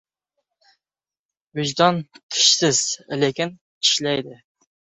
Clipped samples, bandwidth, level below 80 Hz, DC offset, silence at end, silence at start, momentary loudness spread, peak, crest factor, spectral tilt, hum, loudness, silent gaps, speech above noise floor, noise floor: under 0.1%; 8.4 kHz; -64 dBFS; under 0.1%; 0.5 s; 1.55 s; 13 LU; -2 dBFS; 22 dB; -2.5 dB/octave; none; -19 LUFS; 2.23-2.29 s, 3.61-3.81 s; over 69 dB; under -90 dBFS